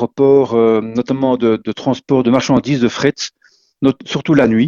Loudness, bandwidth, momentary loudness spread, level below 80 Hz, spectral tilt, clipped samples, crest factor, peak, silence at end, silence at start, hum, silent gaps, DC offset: -15 LUFS; 7.6 kHz; 8 LU; -50 dBFS; -6 dB/octave; under 0.1%; 14 dB; 0 dBFS; 0 s; 0 s; none; none; under 0.1%